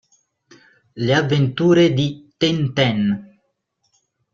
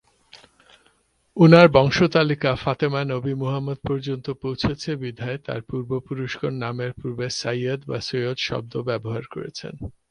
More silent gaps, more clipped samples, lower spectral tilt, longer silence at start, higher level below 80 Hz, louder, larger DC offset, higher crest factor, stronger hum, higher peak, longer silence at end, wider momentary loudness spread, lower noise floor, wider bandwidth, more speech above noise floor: neither; neither; about the same, -6.5 dB/octave vs -6.5 dB/octave; first, 0.95 s vs 0.35 s; second, -56 dBFS vs -50 dBFS; first, -18 LUFS vs -22 LUFS; neither; about the same, 18 dB vs 22 dB; neither; about the same, -2 dBFS vs 0 dBFS; first, 1.1 s vs 0.2 s; second, 9 LU vs 15 LU; first, -70 dBFS vs -63 dBFS; second, 7.6 kHz vs 10 kHz; first, 53 dB vs 41 dB